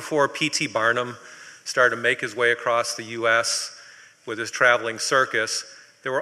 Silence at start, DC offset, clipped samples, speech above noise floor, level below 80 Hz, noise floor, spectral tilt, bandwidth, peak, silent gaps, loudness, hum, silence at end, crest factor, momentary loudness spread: 0 s; under 0.1%; under 0.1%; 25 dB; -72 dBFS; -48 dBFS; -2 dB/octave; 14.5 kHz; -4 dBFS; none; -22 LUFS; none; 0 s; 20 dB; 15 LU